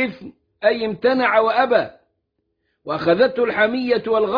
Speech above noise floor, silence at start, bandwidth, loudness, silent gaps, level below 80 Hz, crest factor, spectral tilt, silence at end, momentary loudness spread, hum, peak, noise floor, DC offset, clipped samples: 55 dB; 0 s; 5.2 kHz; -18 LUFS; none; -60 dBFS; 16 dB; -7.5 dB/octave; 0 s; 7 LU; none; -4 dBFS; -73 dBFS; under 0.1%; under 0.1%